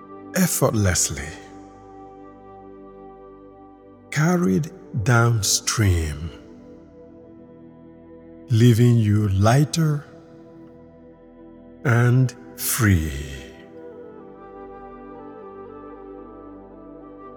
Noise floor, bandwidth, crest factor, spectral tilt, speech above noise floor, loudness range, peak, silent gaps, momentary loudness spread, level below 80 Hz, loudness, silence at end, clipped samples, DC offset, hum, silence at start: -46 dBFS; 19.5 kHz; 20 dB; -5 dB/octave; 28 dB; 16 LU; -2 dBFS; none; 25 LU; -42 dBFS; -20 LUFS; 0 s; under 0.1%; under 0.1%; none; 0 s